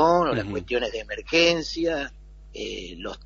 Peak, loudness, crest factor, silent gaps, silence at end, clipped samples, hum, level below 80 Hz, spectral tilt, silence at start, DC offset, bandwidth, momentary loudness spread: -6 dBFS; -24 LUFS; 18 dB; none; 0 s; under 0.1%; none; -46 dBFS; -4 dB/octave; 0 s; under 0.1%; 7.4 kHz; 16 LU